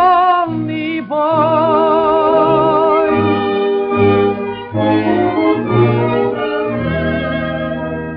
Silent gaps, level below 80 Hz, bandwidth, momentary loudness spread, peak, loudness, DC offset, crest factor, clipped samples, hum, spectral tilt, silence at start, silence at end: none; -44 dBFS; 5.2 kHz; 7 LU; 0 dBFS; -14 LUFS; under 0.1%; 12 dB; under 0.1%; none; -5.5 dB/octave; 0 s; 0 s